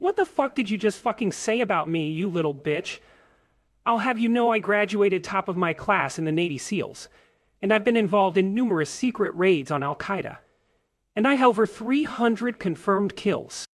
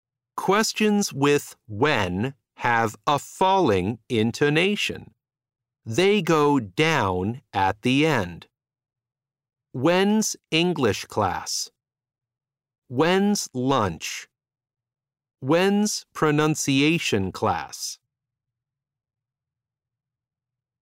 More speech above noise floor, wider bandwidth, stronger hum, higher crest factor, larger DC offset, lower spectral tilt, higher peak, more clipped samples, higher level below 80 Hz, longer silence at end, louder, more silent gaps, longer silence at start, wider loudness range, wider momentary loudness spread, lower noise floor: second, 47 dB vs 66 dB; second, 12 kHz vs 16 kHz; neither; about the same, 18 dB vs 18 dB; neither; about the same, -5.5 dB/octave vs -4.5 dB/octave; about the same, -6 dBFS vs -6 dBFS; neither; second, -64 dBFS vs -58 dBFS; second, 0.15 s vs 2.9 s; about the same, -24 LUFS vs -23 LUFS; second, none vs 12.78-12.82 s; second, 0 s vs 0.35 s; about the same, 2 LU vs 4 LU; second, 8 LU vs 11 LU; second, -71 dBFS vs -89 dBFS